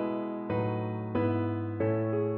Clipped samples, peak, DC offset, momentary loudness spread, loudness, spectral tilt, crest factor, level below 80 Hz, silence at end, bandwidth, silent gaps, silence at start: under 0.1%; -16 dBFS; under 0.1%; 4 LU; -31 LUFS; -8.5 dB/octave; 14 dB; -62 dBFS; 0 s; 4.3 kHz; none; 0 s